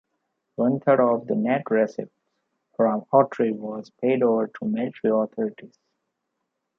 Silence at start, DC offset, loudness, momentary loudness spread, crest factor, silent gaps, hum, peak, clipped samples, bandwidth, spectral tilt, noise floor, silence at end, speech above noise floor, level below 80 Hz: 0.6 s; under 0.1%; -23 LUFS; 12 LU; 20 dB; none; none; -4 dBFS; under 0.1%; 6.6 kHz; -9 dB/octave; -79 dBFS; 1.1 s; 57 dB; -74 dBFS